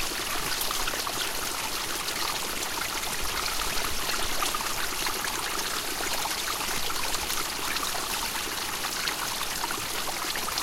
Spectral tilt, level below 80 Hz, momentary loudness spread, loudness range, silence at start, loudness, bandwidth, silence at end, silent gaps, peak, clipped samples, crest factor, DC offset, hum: -0.5 dB/octave; -44 dBFS; 2 LU; 1 LU; 0 s; -28 LUFS; 17 kHz; 0 s; none; -12 dBFS; under 0.1%; 18 dB; under 0.1%; none